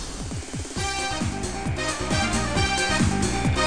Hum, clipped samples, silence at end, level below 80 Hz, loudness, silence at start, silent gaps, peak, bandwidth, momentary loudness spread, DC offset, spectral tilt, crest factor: none; under 0.1%; 0 s; -34 dBFS; -25 LUFS; 0 s; none; -8 dBFS; 10 kHz; 10 LU; 0.6%; -4 dB/octave; 16 dB